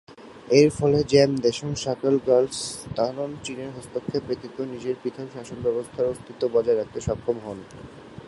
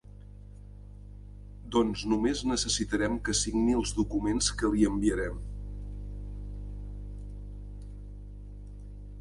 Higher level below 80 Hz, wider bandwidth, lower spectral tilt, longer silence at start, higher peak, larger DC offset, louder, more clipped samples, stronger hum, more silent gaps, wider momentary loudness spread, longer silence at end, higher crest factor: second, -52 dBFS vs -40 dBFS; about the same, 11.5 kHz vs 11.5 kHz; first, -5.5 dB/octave vs -4 dB/octave; about the same, 0.1 s vs 0.05 s; first, -4 dBFS vs -12 dBFS; neither; first, -24 LUFS vs -29 LUFS; neither; second, none vs 50 Hz at -40 dBFS; neither; second, 17 LU vs 22 LU; about the same, 0 s vs 0 s; about the same, 22 dB vs 20 dB